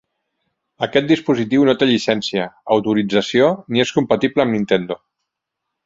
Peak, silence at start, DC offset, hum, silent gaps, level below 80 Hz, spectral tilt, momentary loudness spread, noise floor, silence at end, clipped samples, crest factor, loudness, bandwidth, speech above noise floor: 0 dBFS; 0.8 s; under 0.1%; none; none; -56 dBFS; -5.5 dB/octave; 6 LU; -80 dBFS; 0.9 s; under 0.1%; 18 dB; -17 LUFS; 7.8 kHz; 63 dB